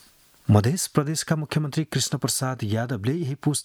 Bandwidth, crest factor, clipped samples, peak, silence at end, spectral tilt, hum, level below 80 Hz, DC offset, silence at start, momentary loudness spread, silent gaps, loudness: 18 kHz; 22 dB; under 0.1%; -2 dBFS; 0 s; -5 dB/octave; none; -58 dBFS; under 0.1%; 0.5 s; 6 LU; none; -24 LUFS